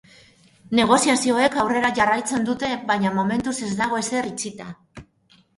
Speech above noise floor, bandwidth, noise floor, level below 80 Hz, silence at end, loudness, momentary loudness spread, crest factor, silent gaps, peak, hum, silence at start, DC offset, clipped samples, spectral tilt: 37 dB; 11.5 kHz; -58 dBFS; -56 dBFS; 0.55 s; -21 LUFS; 13 LU; 18 dB; none; -4 dBFS; none; 0.7 s; under 0.1%; under 0.1%; -3.5 dB/octave